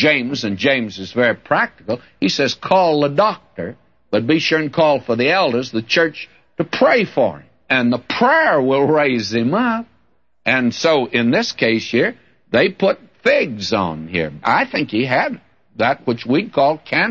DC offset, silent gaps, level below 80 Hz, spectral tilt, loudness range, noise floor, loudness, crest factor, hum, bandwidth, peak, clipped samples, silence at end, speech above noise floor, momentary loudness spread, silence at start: 0.1%; none; -58 dBFS; -5 dB/octave; 2 LU; -63 dBFS; -17 LUFS; 16 dB; none; 7.4 kHz; -2 dBFS; under 0.1%; 0 s; 46 dB; 8 LU; 0 s